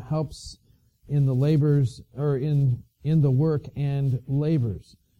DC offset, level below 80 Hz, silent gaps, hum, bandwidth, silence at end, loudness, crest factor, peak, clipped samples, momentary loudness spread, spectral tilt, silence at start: under 0.1%; -52 dBFS; none; none; 9.6 kHz; 0.35 s; -24 LUFS; 12 dB; -12 dBFS; under 0.1%; 10 LU; -9 dB/octave; 0 s